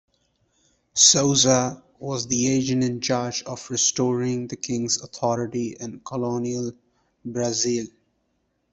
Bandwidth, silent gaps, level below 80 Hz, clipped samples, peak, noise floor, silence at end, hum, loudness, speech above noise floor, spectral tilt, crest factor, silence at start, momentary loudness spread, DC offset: 8.4 kHz; none; -60 dBFS; under 0.1%; -2 dBFS; -71 dBFS; 0.85 s; none; -22 LUFS; 48 dB; -3 dB/octave; 24 dB; 0.95 s; 15 LU; under 0.1%